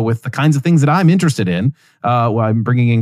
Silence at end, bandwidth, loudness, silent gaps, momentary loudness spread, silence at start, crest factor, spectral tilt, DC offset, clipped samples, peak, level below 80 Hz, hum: 0 s; 14 kHz; -15 LUFS; none; 7 LU; 0 s; 12 dB; -7 dB/octave; under 0.1%; under 0.1%; -2 dBFS; -58 dBFS; none